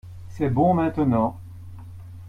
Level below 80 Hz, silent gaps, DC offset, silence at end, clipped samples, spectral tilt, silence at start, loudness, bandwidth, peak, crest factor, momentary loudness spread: -48 dBFS; none; under 0.1%; 0 s; under 0.1%; -10 dB/octave; 0.05 s; -22 LUFS; 11.5 kHz; -8 dBFS; 16 dB; 22 LU